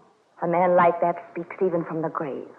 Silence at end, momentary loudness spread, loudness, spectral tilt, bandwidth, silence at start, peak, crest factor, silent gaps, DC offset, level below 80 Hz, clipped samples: 0.1 s; 13 LU; -24 LUFS; -10 dB/octave; 4 kHz; 0.4 s; -8 dBFS; 16 dB; none; under 0.1%; -74 dBFS; under 0.1%